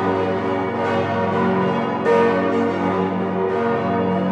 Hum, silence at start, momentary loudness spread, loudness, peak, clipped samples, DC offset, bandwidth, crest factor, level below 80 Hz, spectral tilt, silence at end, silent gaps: none; 0 s; 5 LU; -20 LUFS; -6 dBFS; under 0.1%; under 0.1%; 8.6 kHz; 14 dB; -60 dBFS; -8 dB/octave; 0 s; none